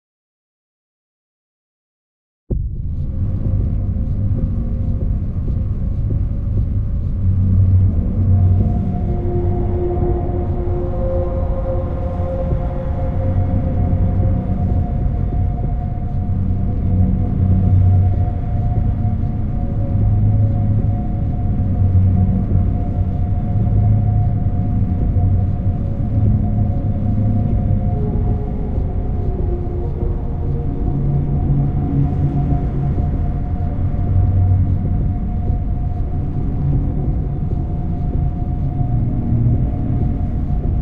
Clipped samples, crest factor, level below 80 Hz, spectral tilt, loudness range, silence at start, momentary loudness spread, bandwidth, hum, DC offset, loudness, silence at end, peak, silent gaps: under 0.1%; 14 dB; -22 dBFS; -12.5 dB/octave; 4 LU; 2.5 s; 7 LU; 2.6 kHz; none; under 0.1%; -19 LUFS; 0 s; -2 dBFS; none